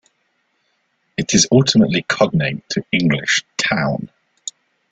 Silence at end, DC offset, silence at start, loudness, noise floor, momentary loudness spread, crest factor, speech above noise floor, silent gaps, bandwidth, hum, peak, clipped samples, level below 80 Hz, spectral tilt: 0.4 s; under 0.1%; 1.2 s; -16 LUFS; -66 dBFS; 19 LU; 18 dB; 50 dB; none; 9.4 kHz; none; 0 dBFS; under 0.1%; -50 dBFS; -4 dB/octave